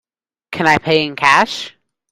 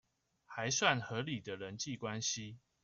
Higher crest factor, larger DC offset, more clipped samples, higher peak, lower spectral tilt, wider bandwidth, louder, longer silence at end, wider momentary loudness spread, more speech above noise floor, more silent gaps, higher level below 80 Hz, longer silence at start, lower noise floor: second, 16 dB vs 26 dB; neither; neither; first, 0 dBFS vs -14 dBFS; about the same, -4 dB/octave vs -3 dB/octave; first, 16 kHz vs 7.8 kHz; first, -14 LUFS vs -37 LUFS; first, 0.4 s vs 0.25 s; first, 16 LU vs 13 LU; about the same, 27 dB vs 24 dB; neither; first, -52 dBFS vs -74 dBFS; about the same, 0.5 s vs 0.5 s; second, -41 dBFS vs -62 dBFS